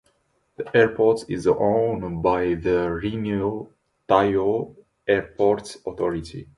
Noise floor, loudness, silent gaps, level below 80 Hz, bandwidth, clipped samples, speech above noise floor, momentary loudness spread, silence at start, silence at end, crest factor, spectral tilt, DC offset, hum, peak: -67 dBFS; -22 LUFS; none; -48 dBFS; 11.5 kHz; under 0.1%; 45 dB; 13 LU; 0.6 s; 0.15 s; 20 dB; -7 dB/octave; under 0.1%; none; -2 dBFS